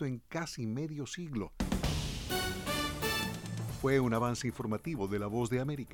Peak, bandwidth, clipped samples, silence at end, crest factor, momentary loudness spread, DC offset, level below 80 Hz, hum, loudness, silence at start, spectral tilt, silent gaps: -16 dBFS; over 20 kHz; under 0.1%; 0 s; 18 dB; 8 LU; under 0.1%; -46 dBFS; none; -35 LUFS; 0 s; -5 dB/octave; none